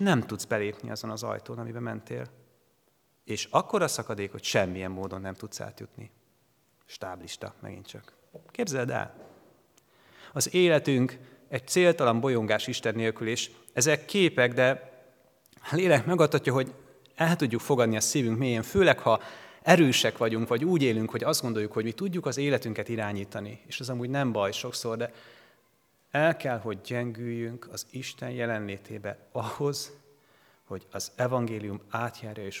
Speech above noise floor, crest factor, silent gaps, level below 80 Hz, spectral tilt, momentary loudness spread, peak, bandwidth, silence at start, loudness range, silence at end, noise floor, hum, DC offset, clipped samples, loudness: 41 dB; 26 dB; none; -66 dBFS; -4.5 dB/octave; 16 LU; -4 dBFS; 19 kHz; 0 s; 11 LU; 0 s; -69 dBFS; none; under 0.1%; under 0.1%; -28 LUFS